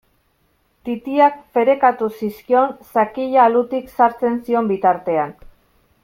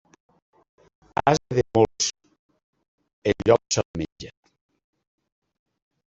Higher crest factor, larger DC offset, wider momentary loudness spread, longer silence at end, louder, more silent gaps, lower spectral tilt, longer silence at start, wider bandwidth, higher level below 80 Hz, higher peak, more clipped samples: second, 16 dB vs 24 dB; neither; second, 10 LU vs 14 LU; second, 0.7 s vs 1.8 s; first, -18 LUFS vs -23 LUFS; second, none vs 2.39-2.49 s, 2.63-2.73 s, 2.88-2.98 s, 3.13-3.22 s, 3.85-3.94 s, 4.12-4.16 s; first, -7 dB/octave vs -4.5 dB/octave; second, 0.85 s vs 1.25 s; first, 16 kHz vs 8.2 kHz; about the same, -56 dBFS vs -54 dBFS; about the same, -2 dBFS vs -4 dBFS; neither